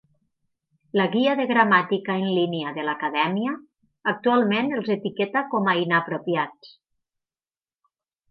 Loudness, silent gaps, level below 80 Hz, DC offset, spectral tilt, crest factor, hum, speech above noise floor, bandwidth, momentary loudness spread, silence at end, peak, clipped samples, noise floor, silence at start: -23 LUFS; none; -76 dBFS; under 0.1%; -8.5 dB/octave; 20 dB; none; over 67 dB; 5.8 kHz; 8 LU; 1.65 s; -4 dBFS; under 0.1%; under -90 dBFS; 0.95 s